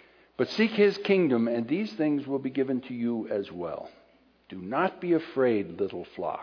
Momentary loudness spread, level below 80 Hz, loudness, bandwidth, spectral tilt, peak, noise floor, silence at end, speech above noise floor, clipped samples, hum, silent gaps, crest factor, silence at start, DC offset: 13 LU; -70 dBFS; -28 LUFS; 5.4 kHz; -7.5 dB/octave; -10 dBFS; -59 dBFS; 0 s; 32 dB; under 0.1%; none; none; 18 dB; 0.4 s; under 0.1%